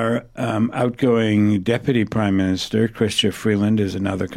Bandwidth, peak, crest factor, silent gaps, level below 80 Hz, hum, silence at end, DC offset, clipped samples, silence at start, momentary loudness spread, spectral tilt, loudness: 13.5 kHz; -6 dBFS; 14 dB; none; -50 dBFS; none; 0 s; under 0.1%; under 0.1%; 0 s; 5 LU; -6 dB/octave; -20 LUFS